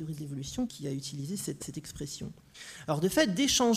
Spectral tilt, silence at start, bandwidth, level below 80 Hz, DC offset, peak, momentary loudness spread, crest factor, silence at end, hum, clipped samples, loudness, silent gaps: -4 dB/octave; 0 s; 15.5 kHz; -56 dBFS; under 0.1%; -12 dBFS; 16 LU; 20 dB; 0 s; none; under 0.1%; -32 LUFS; none